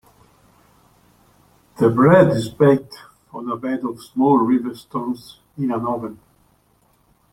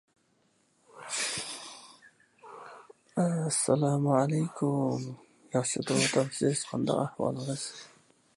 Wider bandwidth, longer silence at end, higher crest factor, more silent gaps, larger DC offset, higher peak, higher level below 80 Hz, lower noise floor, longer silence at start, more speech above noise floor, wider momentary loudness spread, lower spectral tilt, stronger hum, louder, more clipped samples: first, 15 kHz vs 11.5 kHz; first, 1.2 s vs 0.5 s; about the same, 20 dB vs 20 dB; neither; neither; first, -2 dBFS vs -12 dBFS; first, -56 dBFS vs -72 dBFS; second, -60 dBFS vs -70 dBFS; first, 1.8 s vs 0.95 s; about the same, 42 dB vs 41 dB; about the same, 19 LU vs 21 LU; first, -8 dB/octave vs -4.5 dB/octave; neither; first, -18 LUFS vs -30 LUFS; neither